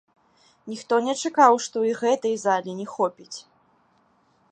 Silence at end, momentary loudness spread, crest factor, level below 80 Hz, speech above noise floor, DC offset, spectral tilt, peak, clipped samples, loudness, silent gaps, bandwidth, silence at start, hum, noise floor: 1.1 s; 20 LU; 22 dB; -80 dBFS; 41 dB; under 0.1%; -3.5 dB/octave; -4 dBFS; under 0.1%; -22 LUFS; none; 9.8 kHz; 0.65 s; none; -63 dBFS